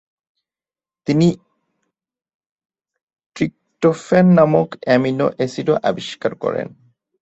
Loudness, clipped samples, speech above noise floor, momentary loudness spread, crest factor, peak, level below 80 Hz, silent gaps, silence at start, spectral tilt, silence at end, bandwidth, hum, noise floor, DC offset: -17 LUFS; under 0.1%; over 74 dB; 12 LU; 20 dB; 0 dBFS; -56 dBFS; 2.34-2.40 s, 2.51-2.56 s, 3.03-3.07 s, 3.26-3.30 s; 1.1 s; -7.5 dB/octave; 0.55 s; 8 kHz; none; under -90 dBFS; under 0.1%